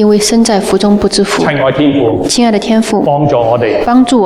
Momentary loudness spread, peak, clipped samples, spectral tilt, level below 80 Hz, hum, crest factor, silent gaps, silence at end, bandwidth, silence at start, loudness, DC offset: 3 LU; 0 dBFS; under 0.1%; -5 dB/octave; -36 dBFS; none; 8 dB; none; 0 s; 14.5 kHz; 0 s; -10 LUFS; under 0.1%